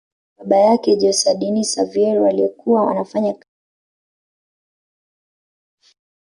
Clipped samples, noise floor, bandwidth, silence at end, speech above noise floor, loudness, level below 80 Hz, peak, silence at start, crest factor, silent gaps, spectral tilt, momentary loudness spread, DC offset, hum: under 0.1%; under -90 dBFS; 11.5 kHz; 2.85 s; over 74 dB; -17 LUFS; -66 dBFS; -4 dBFS; 0.4 s; 16 dB; none; -4.5 dB/octave; 8 LU; under 0.1%; none